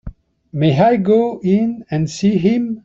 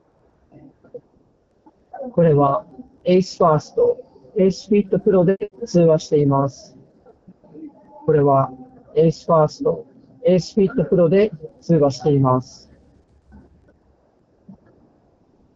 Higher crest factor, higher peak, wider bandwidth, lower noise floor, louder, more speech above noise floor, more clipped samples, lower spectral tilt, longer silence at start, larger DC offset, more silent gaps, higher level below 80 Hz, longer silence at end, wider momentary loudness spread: about the same, 14 dB vs 16 dB; about the same, -2 dBFS vs -4 dBFS; about the same, 7.8 kHz vs 7.8 kHz; second, -35 dBFS vs -59 dBFS; about the same, -16 LUFS vs -18 LUFS; second, 20 dB vs 42 dB; neither; about the same, -7.5 dB/octave vs -8 dB/octave; second, 0.05 s vs 0.95 s; neither; neither; first, -44 dBFS vs -52 dBFS; second, 0.05 s vs 3.15 s; second, 8 LU vs 11 LU